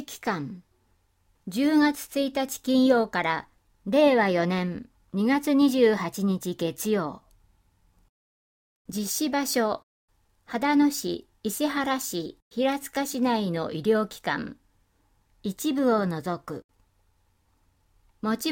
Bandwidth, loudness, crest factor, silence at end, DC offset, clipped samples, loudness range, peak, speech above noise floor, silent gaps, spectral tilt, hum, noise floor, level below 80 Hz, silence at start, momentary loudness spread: 17 kHz; -26 LUFS; 18 dB; 0 s; under 0.1%; under 0.1%; 7 LU; -8 dBFS; 42 dB; 8.09-8.85 s, 9.83-10.08 s, 12.42-12.51 s, 16.64-16.69 s; -4.5 dB/octave; none; -67 dBFS; -64 dBFS; 0 s; 14 LU